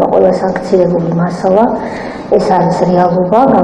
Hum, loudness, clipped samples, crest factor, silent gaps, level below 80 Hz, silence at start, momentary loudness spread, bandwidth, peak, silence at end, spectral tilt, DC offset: none; -11 LUFS; 1%; 10 dB; none; -40 dBFS; 0 s; 5 LU; 10 kHz; 0 dBFS; 0 s; -8 dB/octave; under 0.1%